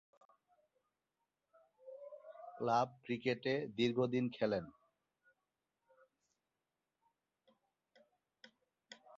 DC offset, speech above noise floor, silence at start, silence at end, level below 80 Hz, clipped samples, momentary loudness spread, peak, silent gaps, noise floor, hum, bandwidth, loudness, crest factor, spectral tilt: under 0.1%; over 53 dB; 1.85 s; 0 s; -80 dBFS; under 0.1%; 19 LU; -22 dBFS; none; under -90 dBFS; none; 7.4 kHz; -38 LUFS; 22 dB; -4.5 dB/octave